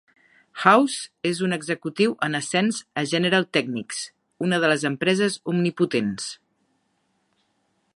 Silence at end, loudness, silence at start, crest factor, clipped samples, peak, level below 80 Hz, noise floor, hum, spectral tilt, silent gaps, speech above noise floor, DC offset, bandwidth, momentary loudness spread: 1.6 s; -23 LUFS; 0.55 s; 22 dB; under 0.1%; -2 dBFS; -70 dBFS; -70 dBFS; none; -4.5 dB/octave; none; 48 dB; under 0.1%; 11.5 kHz; 13 LU